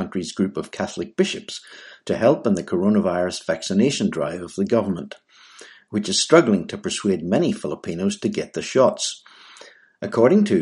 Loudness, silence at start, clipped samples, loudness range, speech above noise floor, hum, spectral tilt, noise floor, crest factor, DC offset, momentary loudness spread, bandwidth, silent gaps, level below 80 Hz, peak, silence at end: -21 LUFS; 0 s; under 0.1%; 3 LU; 26 dB; none; -5 dB/octave; -47 dBFS; 22 dB; under 0.1%; 13 LU; 11.5 kHz; none; -60 dBFS; 0 dBFS; 0 s